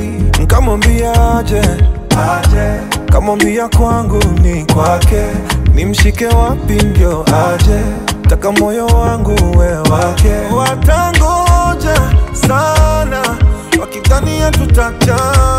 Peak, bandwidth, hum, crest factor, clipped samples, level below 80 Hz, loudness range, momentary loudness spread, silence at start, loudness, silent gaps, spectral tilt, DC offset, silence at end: 0 dBFS; 16 kHz; none; 10 dB; under 0.1%; -14 dBFS; 1 LU; 3 LU; 0 s; -11 LUFS; none; -5.5 dB/octave; under 0.1%; 0 s